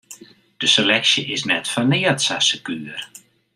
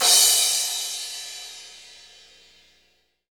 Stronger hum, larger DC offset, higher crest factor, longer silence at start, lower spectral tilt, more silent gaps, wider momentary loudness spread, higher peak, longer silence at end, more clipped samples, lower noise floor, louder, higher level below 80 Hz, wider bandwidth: second, none vs 60 Hz at -70 dBFS; neither; about the same, 20 dB vs 22 dB; about the same, 0.1 s vs 0 s; first, -2.5 dB/octave vs 3.5 dB/octave; neither; second, 15 LU vs 25 LU; about the same, -2 dBFS vs -2 dBFS; second, 0.4 s vs 1.55 s; neither; second, -44 dBFS vs -66 dBFS; about the same, -17 LUFS vs -19 LUFS; first, -66 dBFS vs -74 dBFS; second, 15.5 kHz vs over 20 kHz